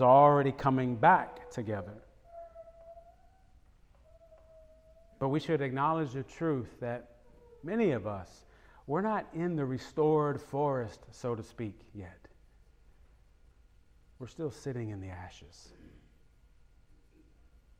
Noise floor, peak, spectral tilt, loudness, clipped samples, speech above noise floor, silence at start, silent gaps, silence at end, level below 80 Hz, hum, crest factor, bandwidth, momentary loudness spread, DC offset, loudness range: -62 dBFS; -10 dBFS; -7.5 dB/octave; -31 LUFS; under 0.1%; 31 dB; 0 s; none; 2.3 s; -62 dBFS; none; 22 dB; 10 kHz; 25 LU; under 0.1%; 13 LU